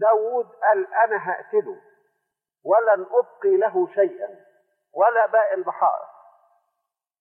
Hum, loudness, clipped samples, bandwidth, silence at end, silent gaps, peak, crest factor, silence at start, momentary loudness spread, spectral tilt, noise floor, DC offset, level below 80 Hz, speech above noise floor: none; -21 LUFS; under 0.1%; 3.1 kHz; 1.15 s; none; -6 dBFS; 16 dB; 0 s; 16 LU; -9 dB/octave; -81 dBFS; under 0.1%; under -90 dBFS; 60 dB